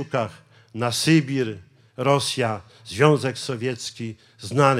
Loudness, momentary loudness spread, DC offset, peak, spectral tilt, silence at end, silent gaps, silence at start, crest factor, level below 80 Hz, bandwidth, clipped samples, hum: -23 LUFS; 16 LU; under 0.1%; -2 dBFS; -5 dB/octave; 0 s; none; 0 s; 22 dB; -68 dBFS; 15.5 kHz; under 0.1%; none